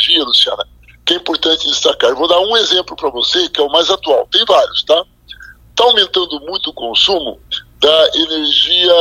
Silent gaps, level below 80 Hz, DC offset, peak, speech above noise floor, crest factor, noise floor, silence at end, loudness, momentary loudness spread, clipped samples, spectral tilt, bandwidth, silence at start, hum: none; -46 dBFS; under 0.1%; 0 dBFS; 24 dB; 14 dB; -37 dBFS; 0 s; -12 LUFS; 11 LU; under 0.1%; -1.5 dB/octave; 15.5 kHz; 0 s; none